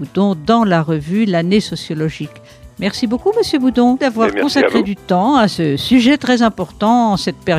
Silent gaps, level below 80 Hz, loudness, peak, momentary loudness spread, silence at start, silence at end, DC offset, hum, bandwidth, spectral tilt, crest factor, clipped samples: none; -44 dBFS; -15 LUFS; -2 dBFS; 8 LU; 0 s; 0 s; under 0.1%; none; 14 kHz; -6 dB/octave; 12 dB; under 0.1%